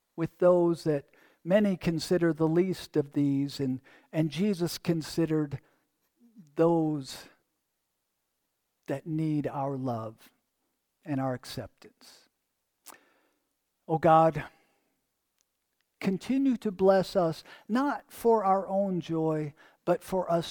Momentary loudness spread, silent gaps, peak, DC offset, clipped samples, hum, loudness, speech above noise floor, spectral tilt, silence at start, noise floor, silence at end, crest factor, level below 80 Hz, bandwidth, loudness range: 14 LU; none; -10 dBFS; under 0.1%; under 0.1%; none; -28 LUFS; 53 dB; -7 dB/octave; 0.15 s; -81 dBFS; 0 s; 20 dB; -64 dBFS; 19 kHz; 8 LU